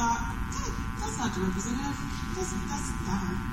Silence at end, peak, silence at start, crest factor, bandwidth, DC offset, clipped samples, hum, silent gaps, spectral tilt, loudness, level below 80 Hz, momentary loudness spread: 0 s; -16 dBFS; 0 s; 14 dB; 16 kHz; under 0.1%; under 0.1%; none; none; -4.5 dB/octave; -32 LUFS; -38 dBFS; 4 LU